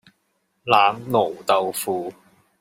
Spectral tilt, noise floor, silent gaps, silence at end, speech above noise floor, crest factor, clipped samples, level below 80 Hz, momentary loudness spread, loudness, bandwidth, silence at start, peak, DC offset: -3.5 dB/octave; -70 dBFS; none; 0.5 s; 50 dB; 20 dB; under 0.1%; -68 dBFS; 13 LU; -21 LUFS; 16 kHz; 0.65 s; -2 dBFS; under 0.1%